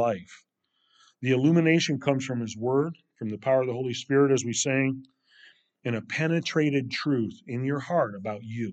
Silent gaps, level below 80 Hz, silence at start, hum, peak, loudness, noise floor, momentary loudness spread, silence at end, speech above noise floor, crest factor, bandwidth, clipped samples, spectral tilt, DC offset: none; -76 dBFS; 0 s; none; -10 dBFS; -26 LUFS; -69 dBFS; 12 LU; 0 s; 43 dB; 18 dB; 9 kHz; under 0.1%; -5.5 dB/octave; under 0.1%